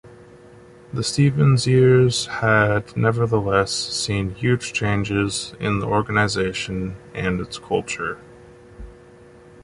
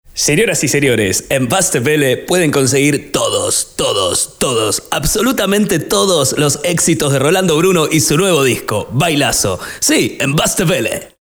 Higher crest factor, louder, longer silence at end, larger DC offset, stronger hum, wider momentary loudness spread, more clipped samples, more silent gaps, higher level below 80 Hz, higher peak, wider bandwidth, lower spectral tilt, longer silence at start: about the same, 16 dB vs 12 dB; second, -20 LUFS vs -13 LUFS; first, 0.75 s vs 0.15 s; neither; neither; first, 11 LU vs 4 LU; neither; neither; second, -44 dBFS vs -38 dBFS; about the same, -4 dBFS vs -2 dBFS; second, 11.5 kHz vs over 20 kHz; first, -5.5 dB/octave vs -3.5 dB/octave; about the same, 0.05 s vs 0.15 s